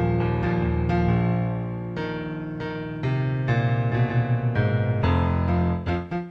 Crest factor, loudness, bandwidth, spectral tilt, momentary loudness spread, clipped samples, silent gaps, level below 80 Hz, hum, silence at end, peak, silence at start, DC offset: 14 dB; -24 LUFS; 6 kHz; -9.5 dB/octave; 8 LU; under 0.1%; none; -38 dBFS; none; 0 s; -8 dBFS; 0 s; under 0.1%